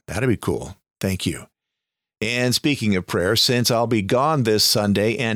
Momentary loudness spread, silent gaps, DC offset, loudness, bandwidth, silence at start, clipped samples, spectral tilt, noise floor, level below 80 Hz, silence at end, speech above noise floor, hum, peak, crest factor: 11 LU; none; under 0.1%; -20 LUFS; over 20 kHz; 0.1 s; under 0.1%; -4 dB/octave; -84 dBFS; -50 dBFS; 0 s; 64 dB; none; -8 dBFS; 14 dB